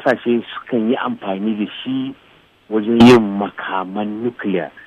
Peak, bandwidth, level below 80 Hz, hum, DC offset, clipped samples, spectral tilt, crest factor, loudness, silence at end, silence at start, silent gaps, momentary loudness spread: -2 dBFS; 11 kHz; -52 dBFS; none; under 0.1%; under 0.1%; -6.5 dB/octave; 14 dB; -17 LUFS; 0.05 s; 0 s; none; 14 LU